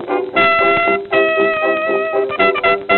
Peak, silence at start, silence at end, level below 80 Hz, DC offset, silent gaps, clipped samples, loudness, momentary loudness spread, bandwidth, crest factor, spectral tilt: 0 dBFS; 0 s; 0 s; -52 dBFS; under 0.1%; none; under 0.1%; -14 LUFS; 5 LU; 4.3 kHz; 14 dB; -7.5 dB/octave